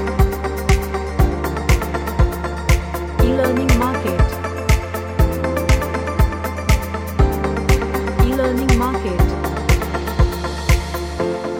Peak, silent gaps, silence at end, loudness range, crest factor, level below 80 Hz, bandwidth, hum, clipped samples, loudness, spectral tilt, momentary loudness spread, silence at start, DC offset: -2 dBFS; none; 0 s; 1 LU; 16 dB; -20 dBFS; 17 kHz; none; under 0.1%; -19 LUFS; -6 dB/octave; 6 LU; 0 s; under 0.1%